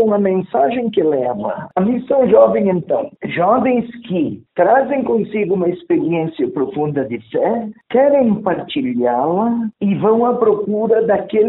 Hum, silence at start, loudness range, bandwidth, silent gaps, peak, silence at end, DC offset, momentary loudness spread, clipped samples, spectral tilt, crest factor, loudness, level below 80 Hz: none; 0 s; 2 LU; 4.1 kHz; none; 0 dBFS; 0 s; under 0.1%; 7 LU; under 0.1%; -6.5 dB/octave; 16 dB; -16 LUFS; -56 dBFS